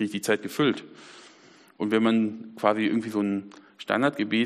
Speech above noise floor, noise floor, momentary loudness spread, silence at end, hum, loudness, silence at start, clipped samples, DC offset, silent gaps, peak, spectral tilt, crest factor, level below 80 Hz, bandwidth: 29 dB; -54 dBFS; 15 LU; 0 s; none; -26 LUFS; 0 s; under 0.1%; under 0.1%; none; -6 dBFS; -5.5 dB/octave; 20 dB; -72 dBFS; 15 kHz